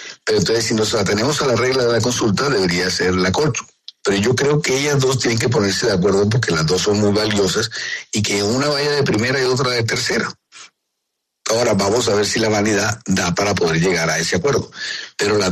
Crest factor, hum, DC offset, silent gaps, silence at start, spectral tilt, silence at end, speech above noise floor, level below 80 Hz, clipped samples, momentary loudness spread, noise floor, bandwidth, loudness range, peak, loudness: 12 dB; none; under 0.1%; none; 0 s; -4 dB/octave; 0 s; 59 dB; -46 dBFS; under 0.1%; 5 LU; -76 dBFS; 13.5 kHz; 2 LU; -4 dBFS; -17 LUFS